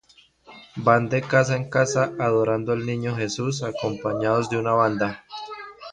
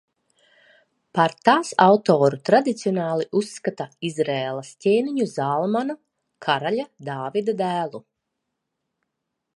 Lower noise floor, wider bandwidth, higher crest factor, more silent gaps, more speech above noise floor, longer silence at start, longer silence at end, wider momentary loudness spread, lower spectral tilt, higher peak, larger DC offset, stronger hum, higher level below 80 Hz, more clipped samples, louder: second, -52 dBFS vs -80 dBFS; second, 10 kHz vs 11.5 kHz; about the same, 20 dB vs 22 dB; neither; second, 30 dB vs 59 dB; second, 0.5 s vs 1.15 s; second, 0 s vs 1.55 s; about the same, 14 LU vs 13 LU; about the same, -5.5 dB/octave vs -5.5 dB/octave; second, -4 dBFS vs 0 dBFS; neither; neither; first, -58 dBFS vs -74 dBFS; neither; about the same, -23 LUFS vs -22 LUFS